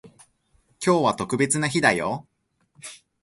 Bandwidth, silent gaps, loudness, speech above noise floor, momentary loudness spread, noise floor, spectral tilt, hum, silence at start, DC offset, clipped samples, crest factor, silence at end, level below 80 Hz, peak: 11.5 kHz; none; -22 LUFS; 43 dB; 21 LU; -65 dBFS; -4 dB/octave; none; 0.05 s; under 0.1%; under 0.1%; 22 dB; 0.3 s; -60 dBFS; -4 dBFS